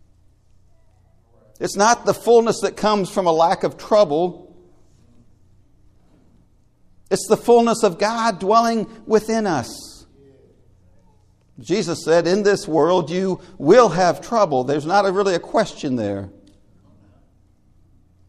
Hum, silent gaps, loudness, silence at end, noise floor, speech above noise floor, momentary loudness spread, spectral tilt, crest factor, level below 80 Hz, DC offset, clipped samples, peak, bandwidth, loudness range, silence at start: none; none; -18 LUFS; 2 s; -55 dBFS; 37 dB; 10 LU; -5 dB/octave; 20 dB; -54 dBFS; under 0.1%; under 0.1%; 0 dBFS; 14.5 kHz; 7 LU; 1.6 s